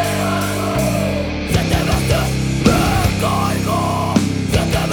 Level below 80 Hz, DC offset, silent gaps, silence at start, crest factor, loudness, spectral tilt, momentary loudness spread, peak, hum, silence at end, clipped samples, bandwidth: -28 dBFS; under 0.1%; none; 0 s; 16 dB; -17 LUFS; -5.5 dB/octave; 4 LU; 0 dBFS; none; 0 s; under 0.1%; over 20 kHz